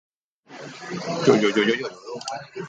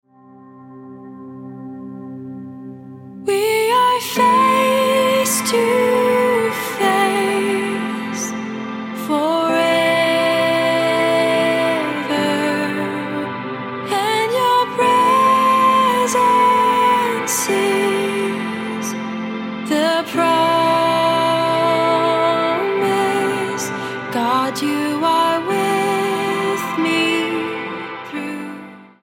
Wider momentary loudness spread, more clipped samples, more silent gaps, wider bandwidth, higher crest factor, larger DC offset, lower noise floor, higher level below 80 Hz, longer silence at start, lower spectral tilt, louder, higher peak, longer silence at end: first, 19 LU vs 14 LU; neither; neither; second, 9 kHz vs 17 kHz; first, 22 dB vs 14 dB; neither; first, -48 dBFS vs -44 dBFS; about the same, -68 dBFS vs -70 dBFS; about the same, 0.5 s vs 0.45 s; first, -5 dB/octave vs -3.5 dB/octave; second, -23 LUFS vs -17 LUFS; about the same, -2 dBFS vs -4 dBFS; second, 0 s vs 0.15 s